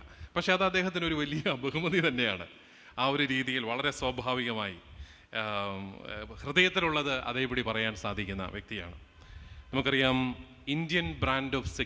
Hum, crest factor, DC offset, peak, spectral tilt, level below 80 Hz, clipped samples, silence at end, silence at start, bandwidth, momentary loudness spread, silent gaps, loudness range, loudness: none; 24 dB; under 0.1%; -8 dBFS; -5 dB/octave; -50 dBFS; under 0.1%; 0 s; 0 s; 8 kHz; 15 LU; none; 3 LU; -30 LUFS